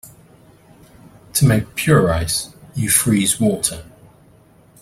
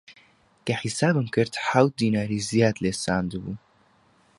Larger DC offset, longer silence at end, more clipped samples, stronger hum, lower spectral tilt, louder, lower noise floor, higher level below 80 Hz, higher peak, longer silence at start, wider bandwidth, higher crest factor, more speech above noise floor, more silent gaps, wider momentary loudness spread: neither; first, 0.95 s vs 0.8 s; neither; neither; about the same, -4.5 dB/octave vs -5.5 dB/octave; first, -17 LUFS vs -24 LUFS; second, -50 dBFS vs -61 dBFS; first, -42 dBFS vs -54 dBFS; first, 0 dBFS vs -4 dBFS; about the same, 0.05 s vs 0.1 s; first, 16 kHz vs 11.5 kHz; about the same, 20 dB vs 22 dB; second, 33 dB vs 37 dB; neither; second, 9 LU vs 13 LU